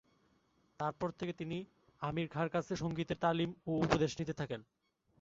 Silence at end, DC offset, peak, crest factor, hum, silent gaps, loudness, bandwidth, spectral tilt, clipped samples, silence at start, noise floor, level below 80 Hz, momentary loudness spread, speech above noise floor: 0.6 s; under 0.1%; -14 dBFS; 24 dB; none; none; -38 LUFS; 7.6 kHz; -5.5 dB/octave; under 0.1%; 0.8 s; -74 dBFS; -62 dBFS; 10 LU; 37 dB